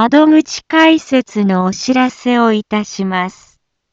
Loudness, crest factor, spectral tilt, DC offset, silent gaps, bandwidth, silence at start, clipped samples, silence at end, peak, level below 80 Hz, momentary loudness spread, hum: -13 LUFS; 12 dB; -5 dB/octave; under 0.1%; none; 7.8 kHz; 0 s; under 0.1%; 0.6 s; 0 dBFS; -56 dBFS; 9 LU; none